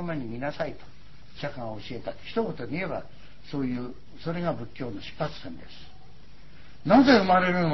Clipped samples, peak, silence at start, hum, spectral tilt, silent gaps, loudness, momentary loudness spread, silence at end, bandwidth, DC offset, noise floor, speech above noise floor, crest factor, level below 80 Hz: under 0.1%; -6 dBFS; 0 s; none; -7 dB/octave; none; -27 LUFS; 19 LU; 0 s; 6 kHz; 1%; -52 dBFS; 25 dB; 22 dB; -54 dBFS